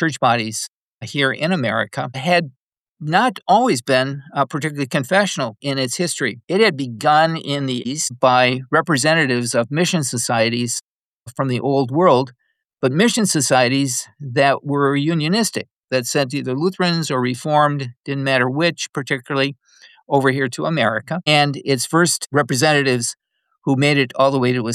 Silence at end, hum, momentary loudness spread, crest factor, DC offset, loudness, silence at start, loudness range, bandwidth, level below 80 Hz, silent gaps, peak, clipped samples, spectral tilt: 0 s; none; 8 LU; 16 dB; under 0.1%; -18 LUFS; 0 s; 2 LU; 14.5 kHz; -68 dBFS; 0.68-0.99 s, 2.56-2.72 s, 2.79-2.95 s, 10.86-11.20 s, 15.78-15.83 s; -2 dBFS; under 0.1%; -4 dB/octave